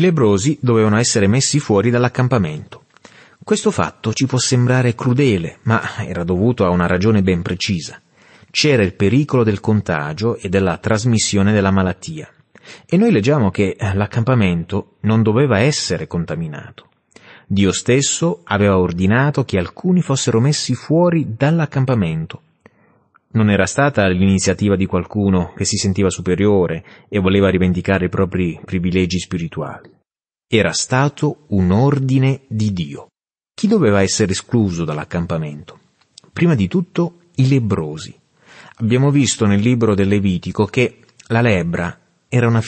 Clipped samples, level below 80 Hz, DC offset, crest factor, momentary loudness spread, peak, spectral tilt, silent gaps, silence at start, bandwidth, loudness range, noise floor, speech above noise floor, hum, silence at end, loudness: under 0.1%; -46 dBFS; under 0.1%; 14 dB; 9 LU; -2 dBFS; -5.5 dB/octave; none; 0 s; 8.8 kHz; 3 LU; -74 dBFS; 59 dB; none; 0 s; -16 LUFS